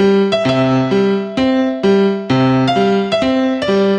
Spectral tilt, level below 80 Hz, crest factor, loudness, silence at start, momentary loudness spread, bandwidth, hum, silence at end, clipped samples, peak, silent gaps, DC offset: -7 dB/octave; -46 dBFS; 12 dB; -14 LUFS; 0 s; 2 LU; 9.2 kHz; none; 0 s; under 0.1%; -2 dBFS; none; under 0.1%